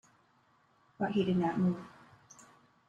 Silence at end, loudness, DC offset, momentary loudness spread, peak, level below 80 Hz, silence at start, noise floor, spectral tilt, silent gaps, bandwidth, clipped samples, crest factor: 1 s; -33 LUFS; under 0.1%; 12 LU; -18 dBFS; -70 dBFS; 1 s; -69 dBFS; -7.5 dB/octave; none; 8.2 kHz; under 0.1%; 18 dB